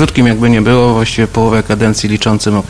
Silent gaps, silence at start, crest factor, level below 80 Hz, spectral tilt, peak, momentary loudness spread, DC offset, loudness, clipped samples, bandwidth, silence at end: none; 0 s; 10 dB; -30 dBFS; -5.5 dB/octave; 0 dBFS; 4 LU; under 0.1%; -11 LUFS; 0.2%; 11 kHz; 0 s